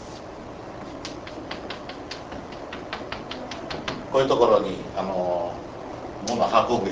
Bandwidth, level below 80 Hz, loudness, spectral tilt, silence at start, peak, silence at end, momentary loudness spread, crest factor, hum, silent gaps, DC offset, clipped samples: 8 kHz; -50 dBFS; -27 LUFS; -5 dB/octave; 0 s; -4 dBFS; 0 s; 17 LU; 22 dB; none; none; under 0.1%; under 0.1%